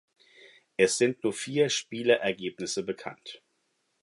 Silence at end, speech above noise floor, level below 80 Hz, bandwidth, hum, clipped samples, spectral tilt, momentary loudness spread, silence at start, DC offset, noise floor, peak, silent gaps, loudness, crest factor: 0.65 s; 47 dB; -72 dBFS; 11.5 kHz; none; under 0.1%; -3.5 dB/octave; 15 LU; 0.8 s; under 0.1%; -75 dBFS; -8 dBFS; none; -28 LUFS; 22 dB